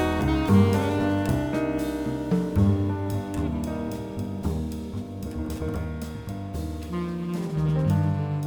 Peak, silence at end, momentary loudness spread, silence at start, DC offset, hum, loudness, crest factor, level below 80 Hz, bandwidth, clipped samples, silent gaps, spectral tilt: -8 dBFS; 0 s; 11 LU; 0 s; under 0.1%; none; -26 LUFS; 18 dB; -38 dBFS; over 20 kHz; under 0.1%; none; -7.5 dB/octave